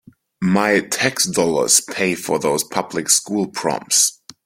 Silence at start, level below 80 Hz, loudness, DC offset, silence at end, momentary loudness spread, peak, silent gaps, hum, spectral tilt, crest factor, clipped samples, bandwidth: 0.4 s; -58 dBFS; -17 LUFS; under 0.1%; 0.3 s; 8 LU; 0 dBFS; none; none; -2.5 dB/octave; 18 dB; under 0.1%; 16.5 kHz